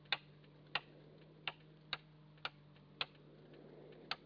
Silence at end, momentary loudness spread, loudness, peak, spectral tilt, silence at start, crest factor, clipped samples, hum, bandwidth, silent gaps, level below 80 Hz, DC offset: 0 s; 18 LU; -46 LUFS; -22 dBFS; 0 dB/octave; 0 s; 28 dB; under 0.1%; none; 5.4 kHz; none; -78 dBFS; under 0.1%